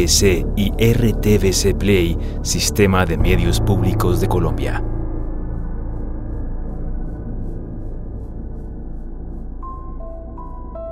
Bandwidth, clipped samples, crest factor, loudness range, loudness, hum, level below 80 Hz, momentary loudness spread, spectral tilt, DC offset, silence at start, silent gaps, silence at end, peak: 16 kHz; under 0.1%; 18 dB; 15 LU; -19 LUFS; none; -24 dBFS; 18 LU; -5 dB/octave; under 0.1%; 0 s; none; 0 s; -2 dBFS